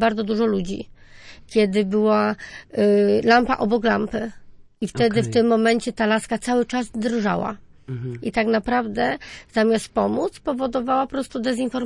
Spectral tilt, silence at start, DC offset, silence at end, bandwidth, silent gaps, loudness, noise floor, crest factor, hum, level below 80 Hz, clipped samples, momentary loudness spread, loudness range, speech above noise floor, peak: -5.5 dB/octave; 0 s; under 0.1%; 0 s; 11.5 kHz; none; -21 LUFS; -44 dBFS; 18 dB; none; -48 dBFS; under 0.1%; 13 LU; 4 LU; 23 dB; -2 dBFS